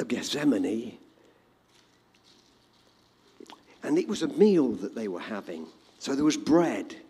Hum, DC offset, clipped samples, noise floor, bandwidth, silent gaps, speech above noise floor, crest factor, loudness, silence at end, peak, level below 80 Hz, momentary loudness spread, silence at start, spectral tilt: 60 Hz at -65 dBFS; under 0.1%; under 0.1%; -63 dBFS; 14 kHz; none; 36 dB; 20 dB; -27 LUFS; 0.05 s; -10 dBFS; -68 dBFS; 17 LU; 0 s; -5 dB/octave